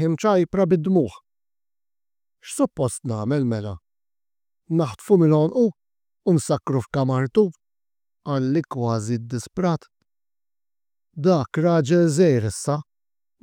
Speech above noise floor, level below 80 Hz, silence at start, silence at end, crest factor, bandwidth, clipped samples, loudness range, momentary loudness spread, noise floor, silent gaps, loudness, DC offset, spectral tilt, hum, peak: over 70 dB; -60 dBFS; 0 s; 0.6 s; 18 dB; 16 kHz; under 0.1%; 6 LU; 11 LU; under -90 dBFS; none; -22 LUFS; under 0.1%; -7 dB/octave; none; -6 dBFS